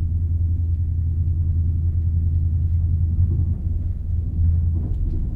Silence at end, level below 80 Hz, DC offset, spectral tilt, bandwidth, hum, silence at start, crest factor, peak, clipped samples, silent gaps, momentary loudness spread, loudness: 0 s; -24 dBFS; under 0.1%; -12.5 dB/octave; 0.9 kHz; none; 0 s; 12 dB; -8 dBFS; under 0.1%; none; 5 LU; -22 LUFS